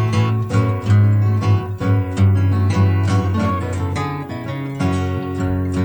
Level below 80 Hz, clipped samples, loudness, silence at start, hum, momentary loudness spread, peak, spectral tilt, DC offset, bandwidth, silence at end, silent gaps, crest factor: -42 dBFS; under 0.1%; -18 LUFS; 0 s; none; 8 LU; -4 dBFS; -8 dB/octave; under 0.1%; 19.5 kHz; 0 s; none; 12 dB